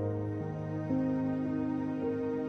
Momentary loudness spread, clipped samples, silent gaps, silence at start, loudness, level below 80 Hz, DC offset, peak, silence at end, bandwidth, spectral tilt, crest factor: 5 LU; under 0.1%; none; 0 s; -34 LUFS; -58 dBFS; under 0.1%; -22 dBFS; 0 s; 6.2 kHz; -10 dB/octave; 12 dB